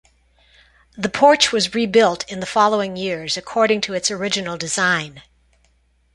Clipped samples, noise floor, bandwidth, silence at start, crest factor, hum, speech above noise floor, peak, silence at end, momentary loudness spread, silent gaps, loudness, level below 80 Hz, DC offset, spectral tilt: under 0.1%; -60 dBFS; 11.5 kHz; 0.95 s; 20 dB; none; 42 dB; 0 dBFS; 0.95 s; 10 LU; none; -18 LUFS; -56 dBFS; under 0.1%; -3 dB/octave